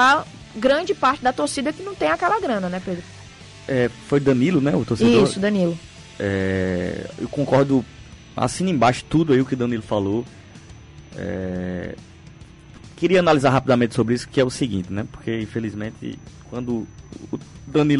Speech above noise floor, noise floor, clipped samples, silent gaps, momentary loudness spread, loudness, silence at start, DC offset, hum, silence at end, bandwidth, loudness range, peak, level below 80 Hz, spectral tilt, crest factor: 23 dB; -43 dBFS; under 0.1%; none; 17 LU; -21 LUFS; 0 s; under 0.1%; none; 0 s; 11.5 kHz; 6 LU; -8 dBFS; -48 dBFS; -6 dB/octave; 14 dB